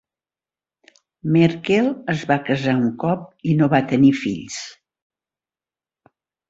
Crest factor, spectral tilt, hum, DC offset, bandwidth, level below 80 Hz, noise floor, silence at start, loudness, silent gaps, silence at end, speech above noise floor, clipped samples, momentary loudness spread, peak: 20 dB; -6.5 dB/octave; none; under 0.1%; 8 kHz; -56 dBFS; under -90 dBFS; 1.25 s; -19 LUFS; none; 1.8 s; over 71 dB; under 0.1%; 13 LU; -2 dBFS